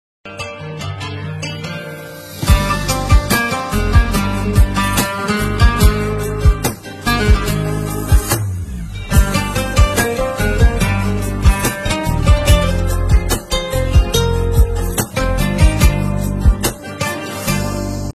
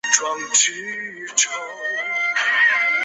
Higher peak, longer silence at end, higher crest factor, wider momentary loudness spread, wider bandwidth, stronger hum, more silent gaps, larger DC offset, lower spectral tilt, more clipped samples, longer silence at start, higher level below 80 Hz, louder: about the same, 0 dBFS vs 0 dBFS; about the same, 0.05 s vs 0 s; second, 14 dB vs 20 dB; about the same, 11 LU vs 12 LU; first, 15 kHz vs 8.4 kHz; neither; neither; neither; first, -5 dB/octave vs 2.5 dB/octave; neither; first, 0.25 s vs 0.05 s; first, -18 dBFS vs -76 dBFS; about the same, -16 LUFS vs -18 LUFS